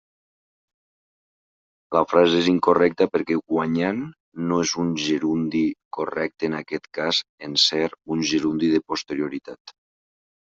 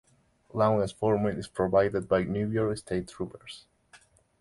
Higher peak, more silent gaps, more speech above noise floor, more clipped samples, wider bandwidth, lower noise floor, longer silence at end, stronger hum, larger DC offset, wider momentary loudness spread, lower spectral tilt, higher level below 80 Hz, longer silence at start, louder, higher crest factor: first, -2 dBFS vs -10 dBFS; first, 4.20-4.32 s, 5.85-5.91 s, 7.29-7.38 s, 9.60-9.65 s vs none; first, over 68 dB vs 34 dB; neither; second, 7.8 kHz vs 11.5 kHz; first, under -90 dBFS vs -62 dBFS; first, 0.8 s vs 0.45 s; neither; neither; about the same, 12 LU vs 13 LU; second, -4.5 dB/octave vs -7 dB/octave; second, -64 dBFS vs -54 dBFS; first, 1.9 s vs 0.55 s; first, -22 LUFS vs -28 LUFS; about the same, 20 dB vs 20 dB